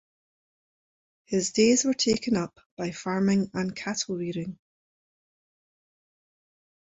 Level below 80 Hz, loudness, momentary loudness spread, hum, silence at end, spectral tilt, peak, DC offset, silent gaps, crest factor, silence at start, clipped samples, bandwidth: -64 dBFS; -26 LUFS; 14 LU; none; 2.3 s; -4 dB/octave; -8 dBFS; under 0.1%; 2.66-2.77 s; 22 dB; 1.3 s; under 0.1%; 8.2 kHz